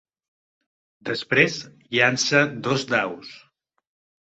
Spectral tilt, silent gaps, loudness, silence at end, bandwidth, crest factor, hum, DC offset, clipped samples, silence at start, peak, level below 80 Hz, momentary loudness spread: -3.5 dB/octave; none; -21 LUFS; 0.85 s; 8.4 kHz; 22 dB; none; under 0.1%; under 0.1%; 1.05 s; -4 dBFS; -66 dBFS; 16 LU